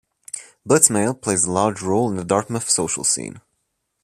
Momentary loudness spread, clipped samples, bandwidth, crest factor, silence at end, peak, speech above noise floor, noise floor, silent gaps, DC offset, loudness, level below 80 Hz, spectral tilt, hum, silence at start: 19 LU; under 0.1%; 15 kHz; 22 dB; 0.65 s; 0 dBFS; 53 dB; -73 dBFS; none; under 0.1%; -18 LUFS; -58 dBFS; -3.5 dB/octave; none; 0.35 s